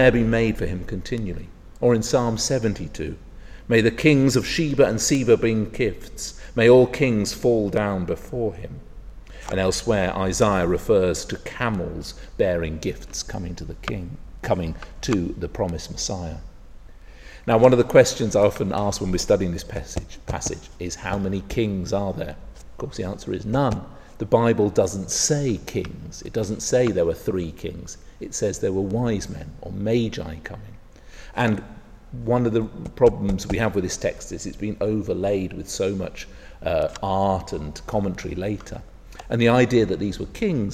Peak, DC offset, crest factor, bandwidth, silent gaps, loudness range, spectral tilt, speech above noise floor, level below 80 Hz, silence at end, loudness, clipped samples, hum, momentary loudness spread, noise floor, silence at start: -2 dBFS; under 0.1%; 22 dB; 15 kHz; none; 8 LU; -5 dB/octave; 20 dB; -40 dBFS; 0 s; -23 LUFS; under 0.1%; none; 16 LU; -42 dBFS; 0 s